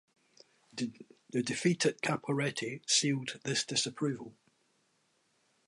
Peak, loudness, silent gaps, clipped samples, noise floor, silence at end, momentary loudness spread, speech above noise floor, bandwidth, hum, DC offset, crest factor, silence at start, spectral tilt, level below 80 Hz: -16 dBFS; -33 LUFS; none; under 0.1%; -74 dBFS; 1.35 s; 12 LU; 41 dB; 11.5 kHz; none; under 0.1%; 20 dB; 0.75 s; -3.5 dB/octave; -78 dBFS